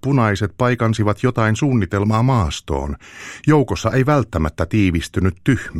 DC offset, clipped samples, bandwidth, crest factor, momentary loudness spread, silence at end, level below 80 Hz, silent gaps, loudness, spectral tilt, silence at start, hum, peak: under 0.1%; under 0.1%; 13 kHz; 16 dB; 7 LU; 0 s; -34 dBFS; none; -18 LUFS; -7 dB/octave; 0.05 s; none; -2 dBFS